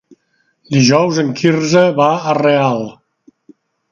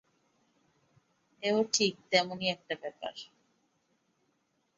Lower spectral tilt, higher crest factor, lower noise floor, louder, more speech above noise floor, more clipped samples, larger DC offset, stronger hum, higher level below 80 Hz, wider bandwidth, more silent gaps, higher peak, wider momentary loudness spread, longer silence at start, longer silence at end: first, -5.5 dB/octave vs -2.5 dB/octave; second, 14 dB vs 26 dB; second, -62 dBFS vs -76 dBFS; first, -13 LUFS vs -31 LUFS; first, 50 dB vs 44 dB; neither; neither; neither; first, -58 dBFS vs -78 dBFS; about the same, 7.4 kHz vs 7.8 kHz; neither; first, 0 dBFS vs -10 dBFS; second, 7 LU vs 15 LU; second, 0.7 s vs 1.4 s; second, 1 s vs 1.55 s